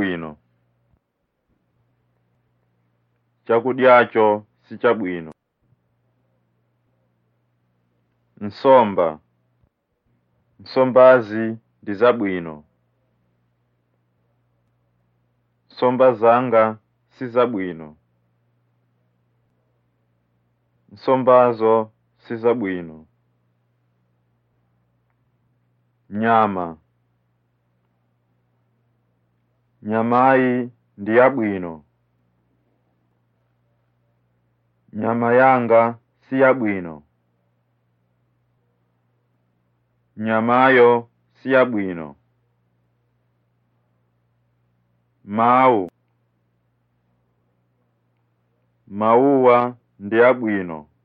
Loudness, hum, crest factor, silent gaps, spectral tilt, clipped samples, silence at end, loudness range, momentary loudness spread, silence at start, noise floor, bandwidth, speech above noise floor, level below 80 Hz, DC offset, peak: -17 LUFS; none; 20 dB; none; -9.5 dB/octave; under 0.1%; 0.2 s; 11 LU; 20 LU; 0 s; -74 dBFS; 5.2 kHz; 57 dB; -70 dBFS; under 0.1%; -2 dBFS